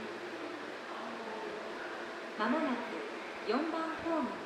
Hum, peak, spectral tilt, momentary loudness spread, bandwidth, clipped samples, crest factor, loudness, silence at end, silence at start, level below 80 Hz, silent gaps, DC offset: none; -20 dBFS; -4.5 dB/octave; 8 LU; 13 kHz; under 0.1%; 18 dB; -38 LUFS; 0 s; 0 s; -74 dBFS; none; under 0.1%